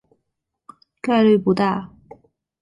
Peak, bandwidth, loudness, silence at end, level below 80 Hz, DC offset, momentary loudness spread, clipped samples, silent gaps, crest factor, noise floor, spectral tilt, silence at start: -6 dBFS; 10.5 kHz; -19 LUFS; 0.75 s; -60 dBFS; under 0.1%; 14 LU; under 0.1%; none; 16 dB; -77 dBFS; -8 dB/octave; 1.05 s